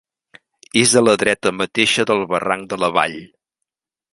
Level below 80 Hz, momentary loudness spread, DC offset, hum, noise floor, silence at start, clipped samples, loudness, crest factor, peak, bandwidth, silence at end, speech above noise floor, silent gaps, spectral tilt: -56 dBFS; 8 LU; under 0.1%; none; -81 dBFS; 0.75 s; under 0.1%; -17 LUFS; 18 dB; 0 dBFS; 11.5 kHz; 0.85 s; 64 dB; none; -3 dB/octave